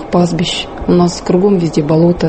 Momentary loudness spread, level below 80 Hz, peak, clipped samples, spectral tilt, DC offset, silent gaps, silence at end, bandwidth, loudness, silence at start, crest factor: 5 LU; -34 dBFS; 0 dBFS; under 0.1%; -6.5 dB/octave; under 0.1%; none; 0 s; 8.8 kHz; -13 LUFS; 0 s; 12 dB